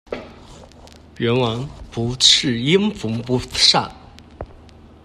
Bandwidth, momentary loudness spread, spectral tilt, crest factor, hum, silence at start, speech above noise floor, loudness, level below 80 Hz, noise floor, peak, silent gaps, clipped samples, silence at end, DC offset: 14 kHz; 23 LU; -3.5 dB/octave; 20 dB; none; 0.1 s; 26 dB; -17 LUFS; -44 dBFS; -44 dBFS; 0 dBFS; none; under 0.1%; 0.55 s; under 0.1%